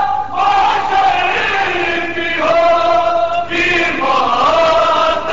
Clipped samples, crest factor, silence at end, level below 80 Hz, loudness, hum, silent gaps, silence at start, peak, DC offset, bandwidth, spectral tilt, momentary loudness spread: under 0.1%; 10 dB; 0 s; -42 dBFS; -13 LUFS; none; none; 0 s; -2 dBFS; 3%; 7.8 kHz; -3.5 dB/octave; 4 LU